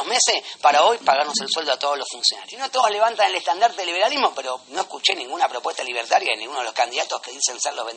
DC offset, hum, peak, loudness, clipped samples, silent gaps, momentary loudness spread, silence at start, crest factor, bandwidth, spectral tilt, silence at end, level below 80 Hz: under 0.1%; none; -2 dBFS; -21 LUFS; under 0.1%; none; 9 LU; 0 s; 18 dB; 8.8 kHz; 1 dB/octave; 0 s; -84 dBFS